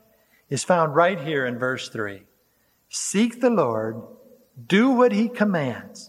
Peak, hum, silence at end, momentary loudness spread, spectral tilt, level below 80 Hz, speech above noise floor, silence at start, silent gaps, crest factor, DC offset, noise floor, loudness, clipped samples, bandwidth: -6 dBFS; none; 0 s; 13 LU; -5 dB/octave; -72 dBFS; 43 dB; 0.5 s; none; 18 dB; under 0.1%; -65 dBFS; -22 LUFS; under 0.1%; 15.5 kHz